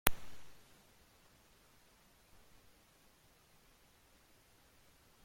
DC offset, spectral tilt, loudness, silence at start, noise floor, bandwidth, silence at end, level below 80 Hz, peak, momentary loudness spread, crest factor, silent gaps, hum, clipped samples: under 0.1%; -2 dB/octave; -41 LUFS; 0.05 s; -68 dBFS; 16.5 kHz; 4.65 s; -58 dBFS; -4 dBFS; 6 LU; 42 dB; none; none; under 0.1%